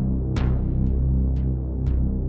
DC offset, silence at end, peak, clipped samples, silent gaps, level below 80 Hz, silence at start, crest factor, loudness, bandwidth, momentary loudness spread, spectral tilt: under 0.1%; 0 s; -12 dBFS; under 0.1%; none; -24 dBFS; 0 s; 10 dB; -24 LUFS; 5.6 kHz; 3 LU; -10 dB/octave